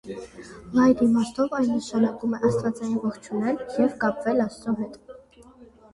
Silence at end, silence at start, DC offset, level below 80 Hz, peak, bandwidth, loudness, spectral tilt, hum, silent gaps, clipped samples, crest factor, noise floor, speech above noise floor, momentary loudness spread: 0.3 s; 0.05 s; under 0.1%; -56 dBFS; -8 dBFS; 11.5 kHz; -24 LUFS; -6.5 dB/octave; none; none; under 0.1%; 16 dB; -50 dBFS; 27 dB; 11 LU